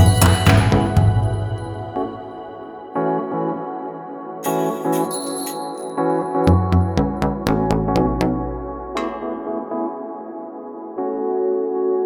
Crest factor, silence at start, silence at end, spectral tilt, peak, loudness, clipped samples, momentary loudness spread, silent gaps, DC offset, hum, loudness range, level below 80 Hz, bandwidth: 18 dB; 0 s; 0 s; -6.5 dB/octave; 0 dBFS; -20 LUFS; under 0.1%; 16 LU; none; under 0.1%; none; 6 LU; -34 dBFS; over 20 kHz